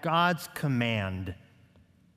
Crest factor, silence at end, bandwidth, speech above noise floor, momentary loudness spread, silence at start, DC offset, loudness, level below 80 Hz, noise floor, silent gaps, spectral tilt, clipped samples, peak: 18 dB; 0.85 s; 16 kHz; 32 dB; 15 LU; 0 s; under 0.1%; -29 LUFS; -66 dBFS; -61 dBFS; none; -5.5 dB/octave; under 0.1%; -12 dBFS